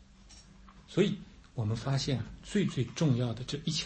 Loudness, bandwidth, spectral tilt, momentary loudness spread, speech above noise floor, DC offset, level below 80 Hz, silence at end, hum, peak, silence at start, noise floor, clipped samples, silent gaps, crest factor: -33 LUFS; 8.8 kHz; -6 dB/octave; 7 LU; 24 dB; under 0.1%; -56 dBFS; 0 s; none; -14 dBFS; 0 s; -55 dBFS; under 0.1%; none; 20 dB